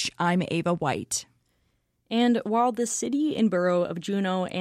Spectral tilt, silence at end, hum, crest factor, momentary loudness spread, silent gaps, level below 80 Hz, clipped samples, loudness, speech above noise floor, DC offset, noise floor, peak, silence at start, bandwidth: -4.5 dB/octave; 0 s; none; 14 dB; 5 LU; none; -66 dBFS; under 0.1%; -26 LUFS; 46 dB; under 0.1%; -71 dBFS; -12 dBFS; 0 s; 14 kHz